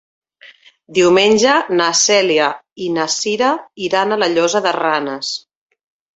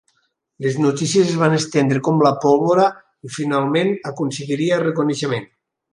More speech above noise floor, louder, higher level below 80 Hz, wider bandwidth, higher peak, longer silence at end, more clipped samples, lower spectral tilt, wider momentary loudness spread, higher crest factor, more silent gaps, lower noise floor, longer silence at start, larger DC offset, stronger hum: second, 30 dB vs 50 dB; first, -15 LUFS vs -18 LUFS; about the same, -60 dBFS vs -64 dBFS; second, 8.2 kHz vs 11.5 kHz; about the same, -2 dBFS vs -2 dBFS; first, 0.75 s vs 0.45 s; neither; second, -2.5 dB/octave vs -5.5 dB/octave; about the same, 11 LU vs 9 LU; about the same, 14 dB vs 16 dB; first, 2.72-2.76 s vs none; second, -45 dBFS vs -67 dBFS; second, 0.45 s vs 0.6 s; neither; neither